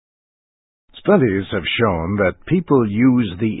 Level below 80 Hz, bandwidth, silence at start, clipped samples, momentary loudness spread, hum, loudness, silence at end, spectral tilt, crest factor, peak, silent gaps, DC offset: -42 dBFS; 4 kHz; 0.95 s; under 0.1%; 6 LU; none; -17 LUFS; 0 s; -12 dB/octave; 18 dB; 0 dBFS; none; under 0.1%